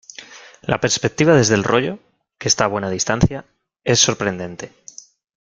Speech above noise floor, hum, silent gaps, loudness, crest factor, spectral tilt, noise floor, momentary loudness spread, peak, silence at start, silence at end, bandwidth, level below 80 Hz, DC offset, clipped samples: 23 dB; none; none; -18 LUFS; 18 dB; -3.5 dB/octave; -41 dBFS; 21 LU; -2 dBFS; 0.2 s; 0.75 s; 10.5 kHz; -44 dBFS; under 0.1%; under 0.1%